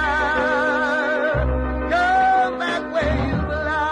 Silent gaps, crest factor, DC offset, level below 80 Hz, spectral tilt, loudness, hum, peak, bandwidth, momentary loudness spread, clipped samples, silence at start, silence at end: none; 12 dB; under 0.1%; -30 dBFS; -6 dB/octave; -20 LUFS; none; -8 dBFS; 10.5 kHz; 6 LU; under 0.1%; 0 s; 0 s